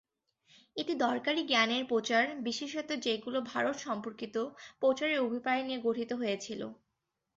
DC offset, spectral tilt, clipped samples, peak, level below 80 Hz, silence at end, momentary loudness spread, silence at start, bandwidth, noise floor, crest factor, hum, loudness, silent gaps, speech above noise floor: under 0.1%; -1 dB/octave; under 0.1%; -12 dBFS; -78 dBFS; 0.6 s; 9 LU; 0.75 s; 7.8 kHz; -85 dBFS; 22 dB; none; -33 LUFS; none; 52 dB